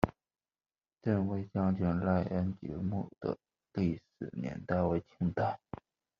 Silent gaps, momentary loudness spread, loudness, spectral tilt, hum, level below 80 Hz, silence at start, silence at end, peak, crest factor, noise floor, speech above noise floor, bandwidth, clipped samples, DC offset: none; 11 LU; -35 LUFS; -8.5 dB/octave; none; -60 dBFS; 0 s; 0.65 s; -8 dBFS; 26 dB; under -90 dBFS; over 57 dB; 5.8 kHz; under 0.1%; under 0.1%